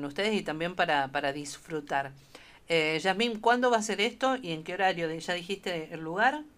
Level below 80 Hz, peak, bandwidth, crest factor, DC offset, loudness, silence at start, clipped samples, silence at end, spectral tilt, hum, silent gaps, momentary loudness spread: -64 dBFS; -10 dBFS; 15.5 kHz; 20 dB; under 0.1%; -29 LUFS; 0 s; under 0.1%; 0.1 s; -3.5 dB/octave; none; none; 10 LU